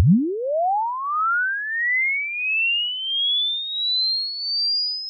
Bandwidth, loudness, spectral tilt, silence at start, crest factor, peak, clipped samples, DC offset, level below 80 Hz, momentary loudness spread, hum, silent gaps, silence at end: 5.4 kHz; -20 LUFS; -8.5 dB/octave; 0 s; 14 dB; -8 dBFS; under 0.1%; under 0.1%; -56 dBFS; 4 LU; none; none; 0 s